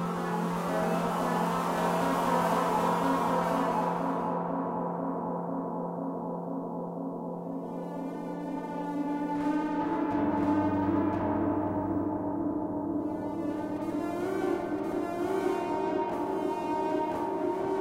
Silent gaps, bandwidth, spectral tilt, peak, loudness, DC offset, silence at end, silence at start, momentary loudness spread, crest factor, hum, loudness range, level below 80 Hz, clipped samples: none; 16 kHz; -7 dB/octave; -14 dBFS; -31 LUFS; under 0.1%; 0 s; 0 s; 8 LU; 16 dB; none; 7 LU; -60 dBFS; under 0.1%